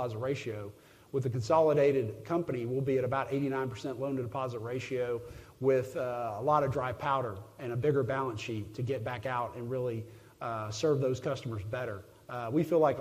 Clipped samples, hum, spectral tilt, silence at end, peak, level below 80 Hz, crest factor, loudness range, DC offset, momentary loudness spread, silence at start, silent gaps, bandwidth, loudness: under 0.1%; none; -7 dB/octave; 0 s; -14 dBFS; -64 dBFS; 18 dB; 4 LU; under 0.1%; 12 LU; 0 s; none; 15.5 kHz; -33 LUFS